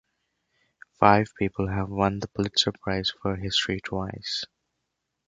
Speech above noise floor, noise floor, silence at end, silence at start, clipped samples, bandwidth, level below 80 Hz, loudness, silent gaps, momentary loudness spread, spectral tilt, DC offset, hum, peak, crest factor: 55 dB; -81 dBFS; 0.85 s; 1 s; under 0.1%; 9.4 kHz; -48 dBFS; -26 LUFS; none; 11 LU; -5 dB/octave; under 0.1%; none; -2 dBFS; 26 dB